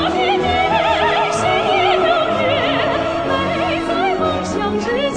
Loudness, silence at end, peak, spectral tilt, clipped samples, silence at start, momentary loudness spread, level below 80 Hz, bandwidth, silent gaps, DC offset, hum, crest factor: -16 LUFS; 0 s; -4 dBFS; -4.5 dB/octave; under 0.1%; 0 s; 4 LU; -40 dBFS; 10 kHz; none; under 0.1%; none; 14 dB